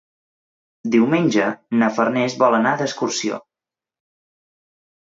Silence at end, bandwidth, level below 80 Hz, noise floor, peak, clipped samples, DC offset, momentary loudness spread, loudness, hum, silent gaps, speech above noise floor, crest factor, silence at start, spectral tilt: 1.65 s; 7.8 kHz; -70 dBFS; -89 dBFS; -4 dBFS; under 0.1%; under 0.1%; 8 LU; -19 LUFS; none; none; 71 dB; 18 dB; 0.85 s; -5 dB/octave